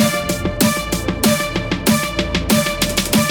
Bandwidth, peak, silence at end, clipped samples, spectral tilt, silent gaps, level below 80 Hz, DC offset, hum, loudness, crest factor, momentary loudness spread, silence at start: over 20 kHz; -2 dBFS; 0 s; under 0.1%; -4 dB/octave; none; -32 dBFS; under 0.1%; none; -17 LUFS; 14 dB; 4 LU; 0 s